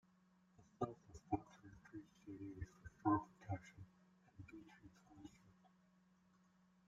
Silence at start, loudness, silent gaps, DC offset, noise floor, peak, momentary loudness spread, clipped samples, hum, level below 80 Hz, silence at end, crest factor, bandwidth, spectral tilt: 0.6 s; -47 LUFS; none; under 0.1%; -75 dBFS; -24 dBFS; 23 LU; under 0.1%; none; -72 dBFS; 1.4 s; 26 dB; 7.8 kHz; -8 dB/octave